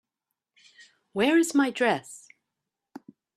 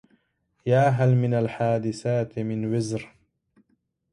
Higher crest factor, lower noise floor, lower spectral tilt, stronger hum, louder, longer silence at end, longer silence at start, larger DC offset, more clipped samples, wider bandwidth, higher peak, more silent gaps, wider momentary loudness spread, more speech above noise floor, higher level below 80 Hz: about the same, 20 dB vs 16 dB; first, -86 dBFS vs -71 dBFS; second, -3.5 dB/octave vs -7.5 dB/octave; neither; about the same, -25 LUFS vs -24 LUFS; first, 1.2 s vs 1.05 s; first, 1.15 s vs 0.65 s; neither; neither; first, 13.5 kHz vs 10.5 kHz; about the same, -10 dBFS vs -10 dBFS; neither; first, 21 LU vs 10 LU; first, 62 dB vs 48 dB; second, -74 dBFS vs -62 dBFS